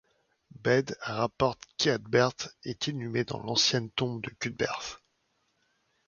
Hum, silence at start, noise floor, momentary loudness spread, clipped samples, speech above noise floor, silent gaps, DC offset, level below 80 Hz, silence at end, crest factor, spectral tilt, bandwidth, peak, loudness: none; 0.65 s; -75 dBFS; 11 LU; under 0.1%; 45 dB; none; under 0.1%; -62 dBFS; 1.1 s; 22 dB; -4 dB/octave; 7.4 kHz; -10 dBFS; -29 LUFS